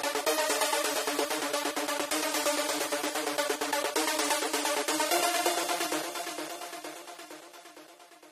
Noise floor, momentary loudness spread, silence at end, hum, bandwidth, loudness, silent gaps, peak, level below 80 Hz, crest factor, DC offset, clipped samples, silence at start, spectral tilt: -53 dBFS; 15 LU; 0 s; none; 15.5 kHz; -29 LUFS; none; -14 dBFS; -76 dBFS; 18 dB; under 0.1%; under 0.1%; 0 s; 0 dB/octave